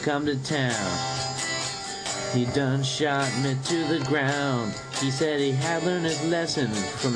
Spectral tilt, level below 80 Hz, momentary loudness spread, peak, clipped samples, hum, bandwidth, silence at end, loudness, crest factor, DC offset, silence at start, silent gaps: -4.5 dB/octave; -58 dBFS; 4 LU; -10 dBFS; under 0.1%; none; 10.5 kHz; 0 s; -26 LUFS; 14 dB; under 0.1%; 0 s; none